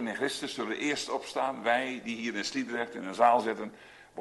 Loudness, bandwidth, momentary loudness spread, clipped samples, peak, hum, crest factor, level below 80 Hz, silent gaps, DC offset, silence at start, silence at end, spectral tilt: -31 LUFS; 12 kHz; 11 LU; under 0.1%; -12 dBFS; none; 20 dB; -72 dBFS; none; under 0.1%; 0 s; 0 s; -3 dB/octave